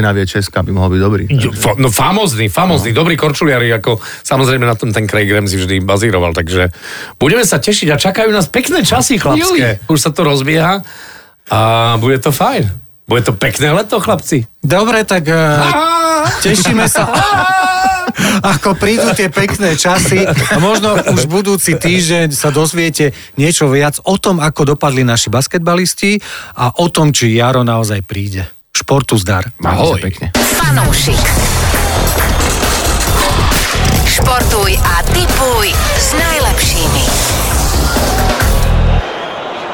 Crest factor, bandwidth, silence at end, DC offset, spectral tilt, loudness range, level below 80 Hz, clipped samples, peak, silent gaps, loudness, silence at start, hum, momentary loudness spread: 10 dB; over 20 kHz; 0 s; under 0.1%; -4 dB/octave; 2 LU; -22 dBFS; under 0.1%; -2 dBFS; none; -11 LUFS; 0 s; none; 5 LU